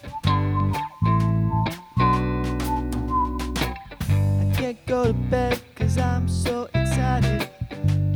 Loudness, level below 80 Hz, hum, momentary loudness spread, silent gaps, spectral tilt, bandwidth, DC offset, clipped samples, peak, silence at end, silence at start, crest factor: -24 LUFS; -34 dBFS; none; 5 LU; none; -6.5 dB/octave; 18.5 kHz; under 0.1%; under 0.1%; -8 dBFS; 0 s; 0.05 s; 16 dB